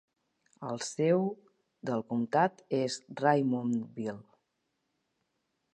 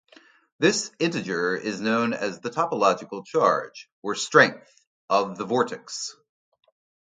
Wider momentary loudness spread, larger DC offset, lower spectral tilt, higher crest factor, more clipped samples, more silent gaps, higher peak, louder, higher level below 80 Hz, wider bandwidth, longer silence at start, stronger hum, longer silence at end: about the same, 13 LU vs 12 LU; neither; first, -6 dB/octave vs -3.5 dB/octave; about the same, 22 dB vs 24 dB; neither; second, none vs 3.92-4.02 s, 4.87-5.08 s; second, -10 dBFS vs 0 dBFS; second, -31 LUFS vs -24 LUFS; second, -80 dBFS vs -72 dBFS; first, 11.5 kHz vs 9.6 kHz; about the same, 0.6 s vs 0.6 s; neither; first, 1.55 s vs 1 s